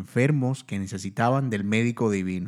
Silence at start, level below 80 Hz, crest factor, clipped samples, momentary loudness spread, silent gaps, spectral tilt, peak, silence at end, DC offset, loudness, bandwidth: 0 s; -66 dBFS; 18 dB; under 0.1%; 8 LU; none; -7 dB/octave; -8 dBFS; 0 s; under 0.1%; -25 LUFS; 12.5 kHz